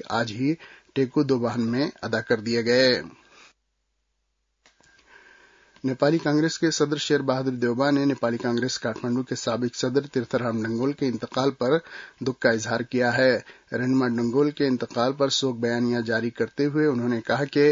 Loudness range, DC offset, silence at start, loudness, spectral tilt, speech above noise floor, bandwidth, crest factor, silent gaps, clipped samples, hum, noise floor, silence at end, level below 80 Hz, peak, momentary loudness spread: 4 LU; under 0.1%; 0.05 s; -24 LUFS; -5 dB/octave; 51 dB; 7.6 kHz; 20 dB; none; under 0.1%; none; -75 dBFS; 0 s; -66 dBFS; -6 dBFS; 6 LU